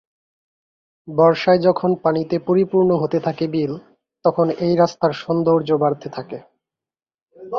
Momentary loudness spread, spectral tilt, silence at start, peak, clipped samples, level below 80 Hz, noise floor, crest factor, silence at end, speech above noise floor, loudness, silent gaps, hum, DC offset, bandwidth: 12 LU; -8 dB/octave; 1.05 s; -2 dBFS; under 0.1%; -60 dBFS; under -90 dBFS; 16 dB; 0 s; over 72 dB; -18 LUFS; 7.22-7.26 s; none; under 0.1%; 6.8 kHz